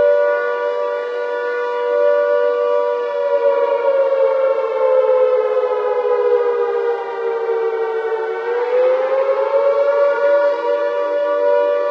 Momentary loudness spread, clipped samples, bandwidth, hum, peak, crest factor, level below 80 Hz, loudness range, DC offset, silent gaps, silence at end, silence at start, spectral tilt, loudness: 6 LU; under 0.1%; 6.2 kHz; none; -4 dBFS; 12 dB; under -90 dBFS; 2 LU; under 0.1%; none; 0 s; 0 s; -3.5 dB/octave; -17 LUFS